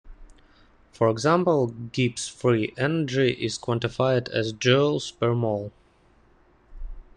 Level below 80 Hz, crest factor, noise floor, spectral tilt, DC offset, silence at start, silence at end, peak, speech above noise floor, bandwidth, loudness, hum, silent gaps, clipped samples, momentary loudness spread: -48 dBFS; 20 dB; -59 dBFS; -5.5 dB/octave; under 0.1%; 0.05 s; 0.15 s; -6 dBFS; 35 dB; 10.5 kHz; -24 LUFS; none; none; under 0.1%; 8 LU